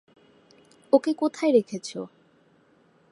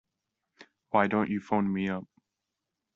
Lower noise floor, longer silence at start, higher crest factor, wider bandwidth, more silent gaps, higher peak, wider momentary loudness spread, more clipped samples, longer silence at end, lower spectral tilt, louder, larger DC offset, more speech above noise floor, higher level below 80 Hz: second, -61 dBFS vs -86 dBFS; first, 0.95 s vs 0.6 s; about the same, 22 dB vs 22 dB; first, 11.5 kHz vs 7 kHz; neither; first, -4 dBFS vs -8 dBFS; first, 16 LU vs 7 LU; neither; first, 1.05 s vs 0.9 s; about the same, -5.5 dB/octave vs -6 dB/octave; first, -24 LUFS vs -29 LUFS; neither; second, 38 dB vs 58 dB; second, -82 dBFS vs -70 dBFS